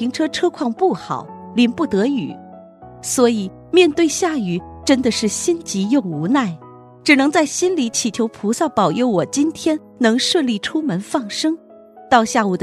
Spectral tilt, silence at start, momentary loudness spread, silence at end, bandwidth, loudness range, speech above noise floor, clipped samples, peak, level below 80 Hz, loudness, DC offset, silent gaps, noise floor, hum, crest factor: -4 dB/octave; 0 s; 10 LU; 0 s; 14 kHz; 2 LU; 22 dB; under 0.1%; 0 dBFS; -54 dBFS; -18 LUFS; under 0.1%; none; -40 dBFS; none; 18 dB